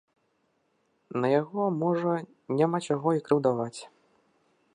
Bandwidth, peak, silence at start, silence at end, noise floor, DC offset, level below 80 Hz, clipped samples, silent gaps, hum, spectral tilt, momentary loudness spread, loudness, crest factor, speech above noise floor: 11 kHz; -10 dBFS; 1.15 s; 0.9 s; -72 dBFS; under 0.1%; -78 dBFS; under 0.1%; none; none; -7 dB/octave; 8 LU; -28 LUFS; 20 dB; 46 dB